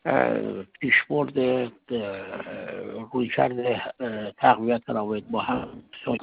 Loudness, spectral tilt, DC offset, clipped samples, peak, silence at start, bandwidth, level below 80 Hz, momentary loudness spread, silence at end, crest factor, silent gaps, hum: -26 LUFS; -10 dB/octave; under 0.1%; under 0.1%; -4 dBFS; 0.05 s; 5 kHz; -62 dBFS; 14 LU; 0 s; 22 dB; none; none